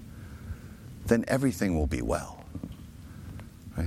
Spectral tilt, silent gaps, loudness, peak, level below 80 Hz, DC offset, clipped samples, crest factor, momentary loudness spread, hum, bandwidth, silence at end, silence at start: -6.5 dB/octave; none; -29 LUFS; -8 dBFS; -42 dBFS; under 0.1%; under 0.1%; 22 dB; 19 LU; none; 16.5 kHz; 0 s; 0 s